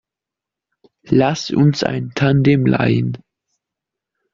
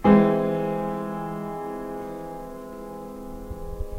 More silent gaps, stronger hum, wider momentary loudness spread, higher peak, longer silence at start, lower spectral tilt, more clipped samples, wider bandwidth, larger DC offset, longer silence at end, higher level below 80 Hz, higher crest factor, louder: neither; neither; second, 7 LU vs 17 LU; about the same, -2 dBFS vs -4 dBFS; first, 1.05 s vs 0 s; second, -6.5 dB/octave vs -8.5 dB/octave; neither; second, 7.4 kHz vs 16 kHz; neither; first, 1.15 s vs 0 s; second, -50 dBFS vs -42 dBFS; second, 16 dB vs 22 dB; first, -16 LUFS vs -26 LUFS